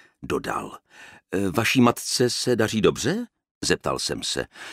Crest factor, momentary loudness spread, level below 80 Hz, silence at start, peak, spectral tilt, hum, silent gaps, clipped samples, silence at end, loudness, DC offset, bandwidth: 20 dB; 11 LU; -52 dBFS; 0.2 s; -4 dBFS; -4 dB/octave; none; 3.51-3.61 s; under 0.1%; 0 s; -24 LUFS; under 0.1%; 16 kHz